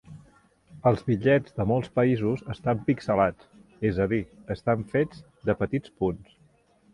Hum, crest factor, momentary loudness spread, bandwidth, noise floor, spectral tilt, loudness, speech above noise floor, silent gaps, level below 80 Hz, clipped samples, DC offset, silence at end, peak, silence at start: none; 18 dB; 7 LU; 11 kHz; -62 dBFS; -9 dB/octave; -26 LUFS; 36 dB; none; -50 dBFS; under 0.1%; under 0.1%; 0.7 s; -8 dBFS; 0.1 s